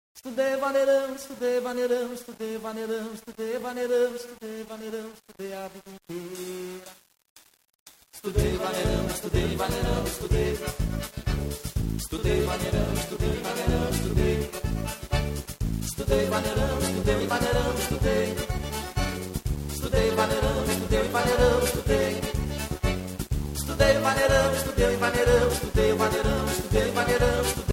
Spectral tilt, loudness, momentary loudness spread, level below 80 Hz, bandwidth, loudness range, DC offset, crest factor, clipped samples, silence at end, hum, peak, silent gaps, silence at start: -5 dB/octave; -26 LUFS; 14 LU; -34 dBFS; 16.5 kHz; 9 LU; under 0.1%; 18 dB; under 0.1%; 0 s; none; -8 dBFS; 7.30-7.36 s, 7.75-7.86 s; 0.15 s